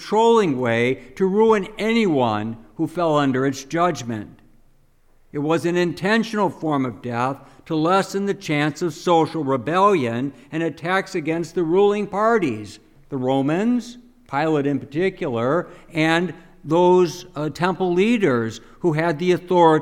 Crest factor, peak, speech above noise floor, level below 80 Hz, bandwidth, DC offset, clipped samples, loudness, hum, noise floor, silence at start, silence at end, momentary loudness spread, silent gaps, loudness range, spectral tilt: 18 dB; -4 dBFS; 35 dB; -54 dBFS; 14.5 kHz; under 0.1%; under 0.1%; -21 LUFS; none; -55 dBFS; 0 s; 0 s; 11 LU; none; 3 LU; -6 dB/octave